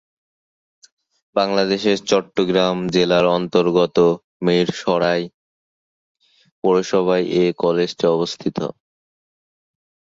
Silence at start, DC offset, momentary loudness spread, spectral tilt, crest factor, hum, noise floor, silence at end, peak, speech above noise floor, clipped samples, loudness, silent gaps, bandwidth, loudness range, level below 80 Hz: 1.35 s; under 0.1%; 7 LU; -5.5 dB/octave; 18 dB; none; under -90 dBFS; 1.35 s; -2 dBFS; over 72 dB; under 0.1%; -18 LUFS; 4.24-4.40 s, 5.34-6.15 s, 6.51-6.62 s; 7.8 kHz; 3 LU; -58 dBFS